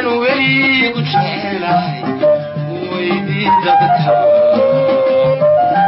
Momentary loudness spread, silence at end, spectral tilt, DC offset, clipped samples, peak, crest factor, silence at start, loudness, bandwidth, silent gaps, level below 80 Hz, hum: 8 LU; 0 s; -3.5 dB/octave; under 0.1%; under 0.1%; -2 dBFS; 10 dB; 0 s; -13 LUFS; 5.8 kHz; none; -54 dBFS; none